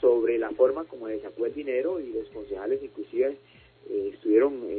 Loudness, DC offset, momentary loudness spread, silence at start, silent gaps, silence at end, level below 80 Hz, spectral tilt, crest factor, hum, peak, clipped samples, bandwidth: -28 LUFS; under 0.1%; 12 LU; 0 s; none; 0 s; -62 dBFS; -10 dB/octave; 18 dB; none; -10 dBFS; under 0.1%; 4.5 kHz